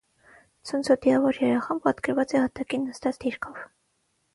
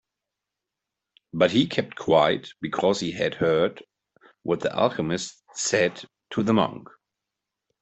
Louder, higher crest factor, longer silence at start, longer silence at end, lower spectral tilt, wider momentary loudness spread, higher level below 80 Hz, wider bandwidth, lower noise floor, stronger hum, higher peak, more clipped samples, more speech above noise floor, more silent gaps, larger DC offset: about the same, -25 LUFS vs -24 LUFS; about the same, 20 dB vs 22 dB; second, 0.65 s vs 1.35 s; second, 0.7 s vs 1 s; about the same, -5.5 dB/octave vs -4.5 dB/octave; first, 15 LU vs 11 LU; about the same, -62 dBFS vs -62 dBFS; first, 11.5 kHz vs 8.4 kHz; second, -72 dBFS vs -86 dBFS; neither; about the same, -6 dBFS vs -4 dBFS; neither; second, 47 dB vs 62 dB; neither; neither